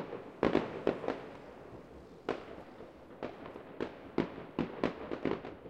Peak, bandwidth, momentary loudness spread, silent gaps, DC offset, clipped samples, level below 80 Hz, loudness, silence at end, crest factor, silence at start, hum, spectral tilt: -12 dBFS; 9.4 kHz; 18 LU; none; under 0.1%; under 0.1%; -62 dBFS; -38 LUFS; 0 s; 26 dB; 0 s; none; -7.5 dB/octave